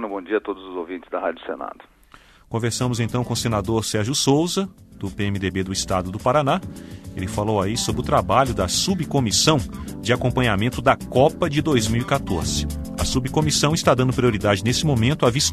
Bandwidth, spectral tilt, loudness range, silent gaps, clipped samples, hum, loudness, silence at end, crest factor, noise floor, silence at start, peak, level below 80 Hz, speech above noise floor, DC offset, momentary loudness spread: 13.5 kHz; -4.5 dB/octave; 4 LU; none; under 0.1%; none; -21 LUFS; 0 s; 20 dB; -50 dBFS; 0 s; -2 dBFS; -38 dBFS; 29 dB; under 0.1%; 12 LU